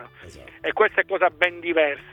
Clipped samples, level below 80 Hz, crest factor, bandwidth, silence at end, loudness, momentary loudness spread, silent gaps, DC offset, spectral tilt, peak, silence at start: under 0.1%; -58 dBFS; 20 dB; 11 kHz; 0.1 s; -22 LUFS; 6 LU; none; under 0.1%; -4.5 dB/octave; -4 dBFS; 0 s